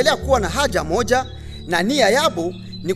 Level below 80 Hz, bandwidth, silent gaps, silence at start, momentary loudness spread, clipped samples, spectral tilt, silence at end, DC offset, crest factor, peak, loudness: -34 dBFS; 14 kHz; none; 0 s; 13 LU; under 0.1%; -4 dB/octave; 0 s; under 0.1%; 16 dB; -2 dBFS; -18 LUFS